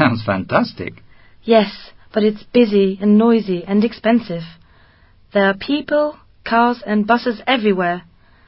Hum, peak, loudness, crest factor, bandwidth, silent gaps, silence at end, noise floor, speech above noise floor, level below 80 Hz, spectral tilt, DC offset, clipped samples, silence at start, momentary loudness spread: none; 0 dBFS; -17 LUFS; 16 dB; 5.8 kHz; none; 0.5 s; -50 dBFS; 33 dB; -50 dBFS; -11 dB/octave; under 0.1%; under 0.1%; 0 s; 14 LU